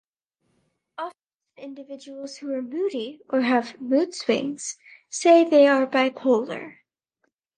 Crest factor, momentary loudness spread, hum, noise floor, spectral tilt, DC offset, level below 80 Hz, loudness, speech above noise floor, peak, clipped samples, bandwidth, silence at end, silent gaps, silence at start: 18 dB; 23 LU; none; -74 dBFS; -3.5 dB/octave; under 0.1%; -80 dBFS; -22 LUFS; 52 dB; -6 dBFS; under 0.1%; 10 kHz; 0.85 s; 1.35-1.39 s; 1 s